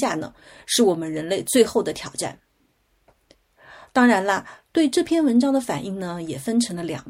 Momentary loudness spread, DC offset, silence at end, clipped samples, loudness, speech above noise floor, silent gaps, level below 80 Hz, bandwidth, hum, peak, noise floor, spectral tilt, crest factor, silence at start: 12 LU; under 0.1%; 0 s; under 0.1%; -22 LUFS; 44 dB; none; -60 dBFS; 16.5 kHz; none; -2 dBFS; -65 dBFS; -4 dB/octave; 20 dB; 0 s